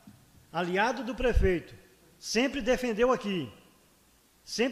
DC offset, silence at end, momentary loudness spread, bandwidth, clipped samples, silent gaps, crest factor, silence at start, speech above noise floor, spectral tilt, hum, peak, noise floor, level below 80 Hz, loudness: under 0.1%; 0 s; 11 LU; 15 kHz; under 0.1%; none; 18 dB; 0.05 s; 35 dB; -5 dB/octave; none; -12 dBFS; -63 dBFS; -40 dBFS; -29 LUFS